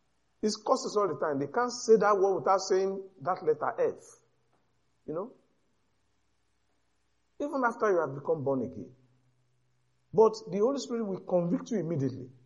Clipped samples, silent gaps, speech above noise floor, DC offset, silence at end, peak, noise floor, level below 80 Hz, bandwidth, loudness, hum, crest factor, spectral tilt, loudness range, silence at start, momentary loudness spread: under 0.1%; none; 48 dB; under 0.1%; 0.15 s; -12 dBFS; -77 dBFS; -76 dBFS; 11 kHz; -30 LUFS; none; 20 dB; -5.5 dB/octave; 12 LU; 0.45 s; 13 LU